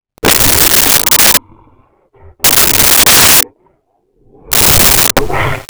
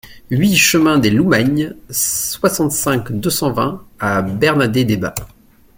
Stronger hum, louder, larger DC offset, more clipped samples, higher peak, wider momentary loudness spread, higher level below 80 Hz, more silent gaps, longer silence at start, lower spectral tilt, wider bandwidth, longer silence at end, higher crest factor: neither; first, -5 LUFS vs -15 LUFS; neither; neither; about the same, 0 dBFS vs 0 dBFS; about the same, 8 LU vs 10 LU; first, -28 dBFS vs -44 dBFS; neither; first, 0.25 s vs 0.05 s; second, -1 dB/octave vs -4 dB/octave; first, over 20 kHz vs 17 kHz; second, 0.05 s vs 0.5 s; second, 10 dB vs 16 dB